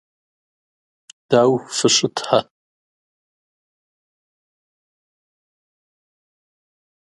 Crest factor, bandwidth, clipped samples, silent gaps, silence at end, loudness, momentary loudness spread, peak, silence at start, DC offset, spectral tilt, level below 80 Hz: 24 dB; 11.5 kHz; under 0.1%; none; 4.8 s; -17 LUFS; 4 LU; 0 dBFS; 1.3 s; under 0.1%; -3.5 dB/octave; -68 dBFS